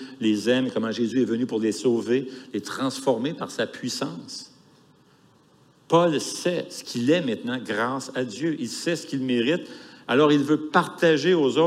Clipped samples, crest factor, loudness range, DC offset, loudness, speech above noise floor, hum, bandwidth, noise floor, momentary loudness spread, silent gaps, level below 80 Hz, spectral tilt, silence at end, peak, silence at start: under 0.1%; 20 dB; 5 LU; under 0.1%; -24 LUFS; 34 dB; none; 15 kHz; -58 dBFS; 10 LU; none; -76 dBFS; -5 dB/octave; 0 s; -6 dBFS; 0 s